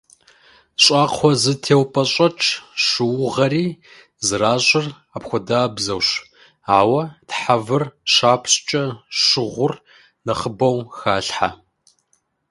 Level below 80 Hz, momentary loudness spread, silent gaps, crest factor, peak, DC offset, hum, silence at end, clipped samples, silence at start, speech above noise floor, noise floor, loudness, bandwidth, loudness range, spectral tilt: -54 dBFS; 11 LU; none; 18 dB; 0 dBFS; under 0.1%; none; 0.95 s; under 0.1%; 0.8 s; 47 dB; -66 dBFS; -18 LUFS; 11.5 kHz; 3 LU; -3.5 dB/octave